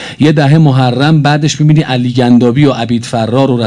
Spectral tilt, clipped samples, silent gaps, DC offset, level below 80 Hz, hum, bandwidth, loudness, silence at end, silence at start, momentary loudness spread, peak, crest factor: -6.5 dB/octave; 2%; none; under 0.1%; -44 dBFS; none; 10.5 kHz; -9 LUFS; 0 s; 0 s; 6 LU; 0 dBFS; 8 dB